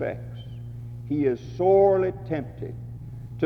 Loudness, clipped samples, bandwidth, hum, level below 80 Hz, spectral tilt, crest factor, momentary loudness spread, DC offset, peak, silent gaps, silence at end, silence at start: -23 LUFS; under 0.1%; 6.2 kHz; none; -50 dBFS; -9.5 dB/octave; 16 dB; 20 LU; under 0.1%; -8 dBFS; none; 0 s; 0 s